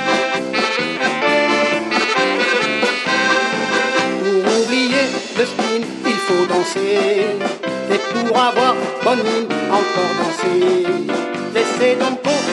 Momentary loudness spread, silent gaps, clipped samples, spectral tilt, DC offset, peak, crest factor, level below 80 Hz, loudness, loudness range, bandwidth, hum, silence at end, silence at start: 5 LU; none; under 0.1%; -3.5 dB/octave; under 0.1%; -2 dBFS; 16 dB; -66 dBFS; -17 LUFS; 2 LU; 11.5 kHz; none; 0 s; 0 s